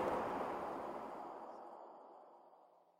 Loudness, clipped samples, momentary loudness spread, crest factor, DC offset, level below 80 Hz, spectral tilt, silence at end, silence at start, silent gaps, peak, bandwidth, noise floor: -45 LUFS; under 0.1%; 21 LU; 18 dB; under 0.1%; -74 dBFS; -6 dB/octave; 0.15 s; 0 s; none; -28 dBFS; 16 kHz; -67 dBFS